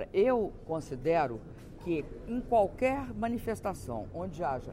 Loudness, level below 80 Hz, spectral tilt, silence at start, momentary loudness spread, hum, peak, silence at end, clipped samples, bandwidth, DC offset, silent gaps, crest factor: -32 LUFS; -50 dBFS; -7 dB/octave; 0 s; 11 LU; none; -16 dBFS; 0 s; under 0.1%; 16 kHz; under 0.1%; none; 16 dB